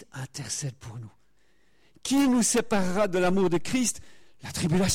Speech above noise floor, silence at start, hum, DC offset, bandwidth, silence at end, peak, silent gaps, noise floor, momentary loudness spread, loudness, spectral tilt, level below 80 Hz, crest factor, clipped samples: 42 dB; 0 s; none; under 0.1%; 16.5 kHz; 0 s; -14 dBFS; none; -68 dBFS; 19 LU; -26 LUFS; -4.5 dB/octave; -52 dBFS; 12 dB; under 0.1%